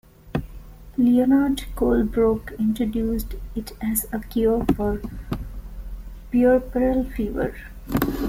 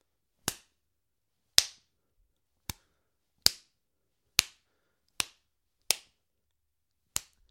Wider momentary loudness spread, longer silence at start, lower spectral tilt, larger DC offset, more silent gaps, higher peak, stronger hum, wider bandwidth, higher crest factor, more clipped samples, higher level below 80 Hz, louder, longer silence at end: about the same, 16 LU vs 18 LU; second, 0.25 s vs 0.45 s; first, -6.5 dB/octave vs 0.5 dB/octave; neither; neither; second, -6 dBFS vs 0 dBFS; neither; about the same, 16.5 kHz vs 16.5 kHz; second, 18 dB vs 38 dB; neither; first, -34 dBFS vs -62 dBFS; first, -23 LUFS vs -30 LUFS; second, 0 s vs 1.55 s